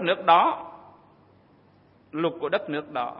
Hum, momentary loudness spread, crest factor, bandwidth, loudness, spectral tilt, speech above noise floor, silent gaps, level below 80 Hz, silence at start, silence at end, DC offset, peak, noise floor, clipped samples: none; 17 LU; 22 dB; 5.4 kHz; -24 LUFS; -9 dB/octave; 34 dB; none; -74 dBFS; 0 s; 0 s; under 0.1%; -6 dBFS; -58 dBFS; under 0.1%